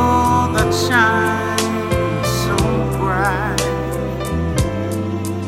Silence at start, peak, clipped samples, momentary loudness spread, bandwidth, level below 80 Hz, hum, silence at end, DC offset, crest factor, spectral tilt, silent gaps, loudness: 0 s; 0 dBFS; under 0.1%; 8 LU; 16.5 kHz; -30 dBFS; none; 0 s; under 0.1%; 18 dB; -5 dB/octave; none; -18 LUFS